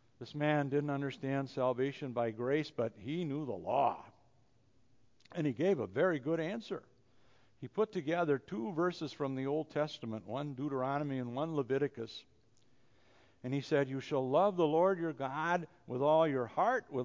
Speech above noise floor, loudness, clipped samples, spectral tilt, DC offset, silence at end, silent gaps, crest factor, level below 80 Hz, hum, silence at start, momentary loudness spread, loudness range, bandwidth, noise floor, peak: 37 dB; -35 LUFS; under 0.1%; -7.5 dB/octave; under 0.1%; 0 s; none; 18 dB; -76 dBFS; none; 0.2 s; 11 LU; 6 LU; 7.6 kHz; -72 dBFS; -16 dBFS